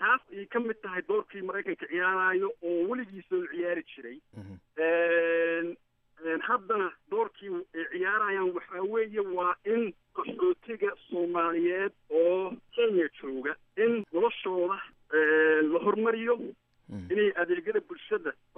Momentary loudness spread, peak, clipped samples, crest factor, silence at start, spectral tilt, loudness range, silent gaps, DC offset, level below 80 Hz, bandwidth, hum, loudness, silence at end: 11 LU; -14 dBFS; under 0.1%; 16 dB; 0 s; -3 dB/octave; 4 LU; none; under 0.1%; -74 dBFS; 3.8 kHz; none; -29 LUFS; 0.25 s